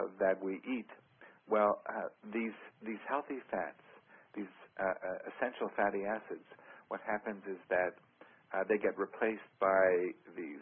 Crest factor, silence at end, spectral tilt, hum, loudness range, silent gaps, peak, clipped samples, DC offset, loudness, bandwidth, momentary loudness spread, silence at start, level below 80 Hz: 20 dB; 0 s; -4 dB/octave; none; 6 LU; none; -16 dBFS; under 0.1%; under 0.1%; -36 LUFS; 3.7 kHz; 15 LU; 0 s; -76 dBFS